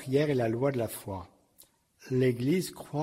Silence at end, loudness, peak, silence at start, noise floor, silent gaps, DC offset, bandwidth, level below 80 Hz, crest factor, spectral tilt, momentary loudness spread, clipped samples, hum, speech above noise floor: 0 s; -30 LUFS; -14 dBFS; 0 s; -62 dBFS; none; under 0.1%; 16 kHz; -64 dBFS; 16 dB; -6.5 dB/octave; 12 LU; under 0.1%; none; 33 dB